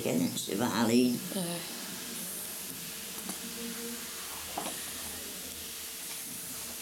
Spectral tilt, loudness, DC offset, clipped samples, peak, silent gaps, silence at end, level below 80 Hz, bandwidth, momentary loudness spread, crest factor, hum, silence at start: -3 dB/octave; -34 LUFS; under 0.1%; under 0.1%; -14 dBFS; none; 0 s; -66 dBFS; 18 kHz; 10 LU; 20 dB; none; 0 s